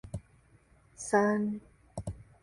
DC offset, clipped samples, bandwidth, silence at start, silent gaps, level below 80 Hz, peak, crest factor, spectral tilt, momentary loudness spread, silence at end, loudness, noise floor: under 0.1%; under 0.1%; 11.5 kHz; 0.05 s; none; -56 dBFS; -12 dBFS; 22 dB; -6 dB/octave; 19 LU; 0.2 s; -32 LUFS; -63 dBFS